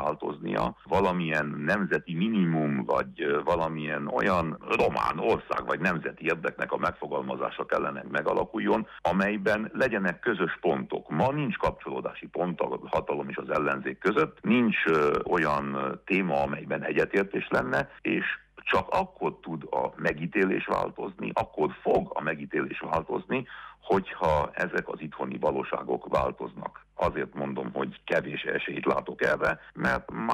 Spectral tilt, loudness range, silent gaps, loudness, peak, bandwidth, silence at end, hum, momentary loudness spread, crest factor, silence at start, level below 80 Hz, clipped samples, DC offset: -7 dB/octave; 4 LU; none; -28 LUFS; -12 dBFS; 14 kHz; 0 s; none; 7 LU; 16 dB; 0 s; -52 dBFS; under 0.1%; under 0.1%